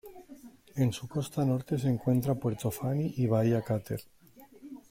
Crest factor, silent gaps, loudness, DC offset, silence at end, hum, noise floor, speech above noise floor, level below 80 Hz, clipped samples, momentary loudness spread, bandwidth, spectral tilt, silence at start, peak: 16 dB; none; -31 LUFS; under 0.1%; 0.1 s; none; -54 dBFS; 24 dB; -60 dBFS; under 0.1%; 21 LU; 16.5 kHz; -7.5 dB/octave; 0.05 s; -14 dBFS